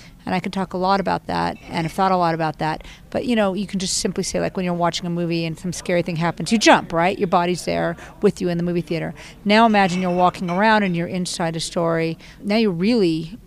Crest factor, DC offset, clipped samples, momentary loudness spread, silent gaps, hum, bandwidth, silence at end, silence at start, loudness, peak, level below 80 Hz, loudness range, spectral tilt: 18 dB; under 0.1%; under 0.1%; 10 LU; none; none; 14.5 kHz; 0.1 s; 0 s; -20 LUFS; -2 dBFS; -46 dBFS; 3 LU; -5 dB/octave